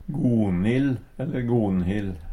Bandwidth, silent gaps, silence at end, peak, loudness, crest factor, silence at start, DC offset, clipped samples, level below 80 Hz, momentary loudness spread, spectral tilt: 10.5 kHz; none; 0 s; -10 dBFS; -24 LUFS; 14 dB; 0 s; under 0.1%; under 0.1%; -42 dBFS; 7 LU; -9 dB/octave